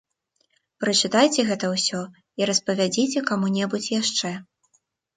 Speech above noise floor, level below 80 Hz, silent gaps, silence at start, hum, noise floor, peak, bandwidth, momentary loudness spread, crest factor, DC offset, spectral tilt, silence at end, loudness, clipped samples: 48 dB; -68 dBFS; none; 0.8 s; none; -71 dBFS; -6 dBFS; 9.6 kHz; 10 LU; 20 dB; under 0.1%; -3.5 dB/octave; 0.75 s; -22 LUFS; under 0.1%